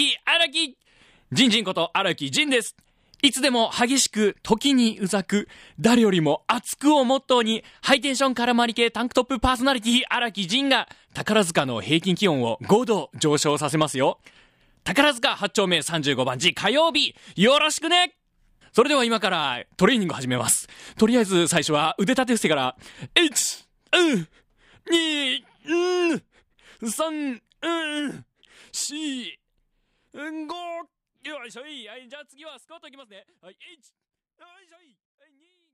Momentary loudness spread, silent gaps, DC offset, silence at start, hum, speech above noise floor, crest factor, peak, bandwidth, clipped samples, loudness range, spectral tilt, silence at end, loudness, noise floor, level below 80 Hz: 15 LU; none; under 0.1%; 0 s; none; 48 dB; 20 dB; -4 dBFS; 15.5 kHz; under 0.1%; 13 LU; -3.5 dB/octave; 2.1 s; -22 LUFS; -70 dBFS; -54 dBFS